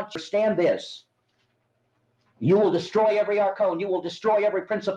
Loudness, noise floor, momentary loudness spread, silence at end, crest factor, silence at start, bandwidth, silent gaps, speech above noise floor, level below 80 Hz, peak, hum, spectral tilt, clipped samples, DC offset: -23 LUFS; -71 dBFS; 8 LU; 0 s; 14 dB; 0 s; 9 kHz; none; 48 dB; -72 dBFS; -10 dBFS; none; -6.5 dB/octave; under 0.1%; under 0.1%